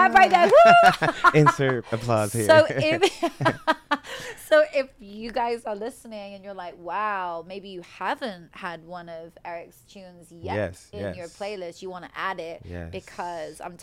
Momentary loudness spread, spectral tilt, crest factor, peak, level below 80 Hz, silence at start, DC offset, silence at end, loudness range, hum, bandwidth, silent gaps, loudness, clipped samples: 22 LU; -5 dB/octave; 20 dB; -2 dBFS; -56 dBFS; 0 s; under 0.1%; 0.05 s; 16 LU; none; 16 kHz; none; -21 LUFS; under 0.1%